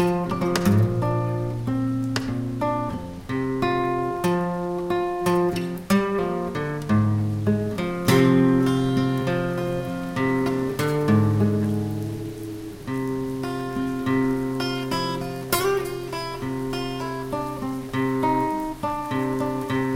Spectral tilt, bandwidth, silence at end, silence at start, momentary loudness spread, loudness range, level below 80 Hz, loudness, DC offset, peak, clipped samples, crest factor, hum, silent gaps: -6.5 dB/octave; 17 kHz; 0 s; 0 s; 9 LU; 5 LU; -46 dBFS; -24 LUFS; under 0.1%; -4 dBFS; under 0.1%; 18 dB; none; none